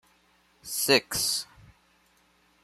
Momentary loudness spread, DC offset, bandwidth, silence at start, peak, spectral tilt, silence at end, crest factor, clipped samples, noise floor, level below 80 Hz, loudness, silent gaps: 22 LU; under 0.1%; 15.5 kHz; 0.65 s; -6 dBFS; -1.5 dB/octave; 1.2 s; 26 dB; under 0.1%; -65 dBFS; -62 dBFS; -25 LUFS; none